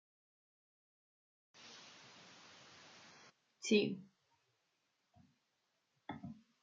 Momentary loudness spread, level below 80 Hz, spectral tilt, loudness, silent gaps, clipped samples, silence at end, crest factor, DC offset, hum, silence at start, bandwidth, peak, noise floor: 25 LU; -88 dBFS; -4 dB/octave; -39 LUFS; none; under 0.1%; 0.3 s; 26 dB; under 0.1%; none; 1.6 s; 7.4 kHz; -20 dBFS; -84 dBFS